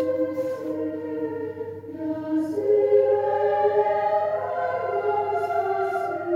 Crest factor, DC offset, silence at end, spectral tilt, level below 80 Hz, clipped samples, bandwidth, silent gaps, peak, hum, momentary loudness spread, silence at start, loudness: 16 dB; under 0.1%; 0 s; -7.5 dB/octave; -68 dBFS; under 0.1%; 11 kHz; none; -8 dBFS; none; 11 LU; 0 s; -24 LUFS